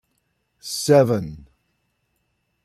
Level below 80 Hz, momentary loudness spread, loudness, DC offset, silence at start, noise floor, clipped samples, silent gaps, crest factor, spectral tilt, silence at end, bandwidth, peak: -56 dBFS; 20 LU; -19 LUFS; under 0.1%; 0.65 s; -71 dBFS; under 0.1%; none; 20 dB; -5.5 dB/octave; 1.25 s; 14.5 kHz; -4 dBFS